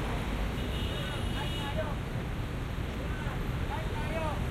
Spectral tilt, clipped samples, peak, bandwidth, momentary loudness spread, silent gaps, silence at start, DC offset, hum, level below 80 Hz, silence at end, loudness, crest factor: -6 dB/octave; under 0.1%; -20 dBFS; 16 kHz; 3 LU; none; 0 s; under 0.1%; none; -38 dBFS; 0 s; -35 LUFS; 12 dB